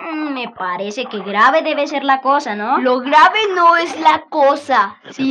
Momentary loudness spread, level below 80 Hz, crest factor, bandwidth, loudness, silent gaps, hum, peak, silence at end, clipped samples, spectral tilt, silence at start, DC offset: 11 LU; -74 dBFS; 14 dB; 9.8 kHz; -15 LUFS; none; none; 0 dBFS; 0 s; under 0.1%; -3.5 dB/octave; 0 s; under 0.1%